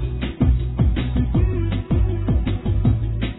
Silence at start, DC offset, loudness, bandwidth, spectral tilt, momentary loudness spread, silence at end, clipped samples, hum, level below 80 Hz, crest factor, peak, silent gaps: 0 s; under 0.1%; -21 LUFS; 4.1 kHz; -12 dB/octave; 3 LU; 0 s; under 0.1%; none; -22 dBFS; 14 dB; -6 dBFS; none